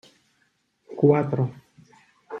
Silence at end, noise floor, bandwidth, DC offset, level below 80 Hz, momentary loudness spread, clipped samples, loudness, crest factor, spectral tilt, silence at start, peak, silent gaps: 0 s; -69 dBFS; 6.8 kHz; under 0.1%; -66 dBFS; 21 LU; under 0.1%; -22 LUFS; 22 dB; -10.5 dB/octave; 0.9 s; -6 dBFS; none